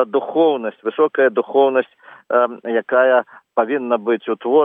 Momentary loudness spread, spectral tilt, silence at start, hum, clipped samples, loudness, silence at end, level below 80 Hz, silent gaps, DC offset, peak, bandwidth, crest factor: 7 LU; -8.5 dB/octave; 0 s; none; under 0.1%; -18 LUFS; 0 s; -86 dBFS; none; under 0.1%; -2 dBFS; 3.8 kHz; 14 dB